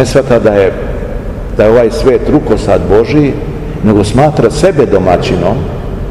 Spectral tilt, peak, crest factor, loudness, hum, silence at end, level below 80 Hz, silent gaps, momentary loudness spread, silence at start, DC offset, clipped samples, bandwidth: -7 dB/octave; 0 dBFS; 8 dB; -9 LUFS; none; 0 s; -22 dBFS; none; 11 LU; 0 s; 0.7%; 4%; 13 kHz